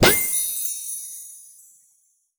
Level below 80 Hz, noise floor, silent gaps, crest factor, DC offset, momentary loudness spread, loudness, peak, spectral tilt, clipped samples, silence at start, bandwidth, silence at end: -48 dBFS; -64 dBFS; none; 22 dB; under 0.1%; 21 LU; -22 LUFS; -2 dBFS; -2 dB/octave; under 0.1%; 0 s; over 20 kHz; 0.95 s